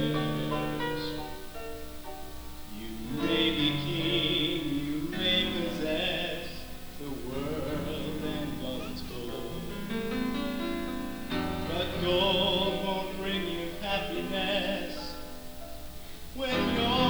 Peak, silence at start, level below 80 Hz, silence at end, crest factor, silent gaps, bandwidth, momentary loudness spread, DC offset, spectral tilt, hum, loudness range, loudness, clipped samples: -14 dBFS; 0 s; -46 dBFS; 0 s; 18 dB; none; over 20 kHz; 16 LU; under 0.1%; -5 dB/octave; none; 7 LU; -31 LUFS; under 0.1%